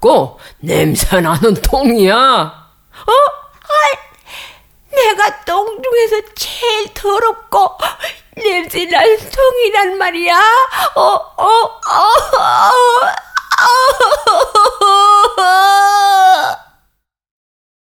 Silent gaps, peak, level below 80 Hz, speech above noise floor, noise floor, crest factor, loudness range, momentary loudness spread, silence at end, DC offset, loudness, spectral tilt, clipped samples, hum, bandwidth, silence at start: none; 0 dBFS; -32 dBFS; 52 dB; -63 dBFS; 12 dB; 6 LU; 10 LU; 1.3 s; under 0.1%; -11 LUFS; -3.5 dB/octave; under 0.1%; none; 19.5 kHz; 0 s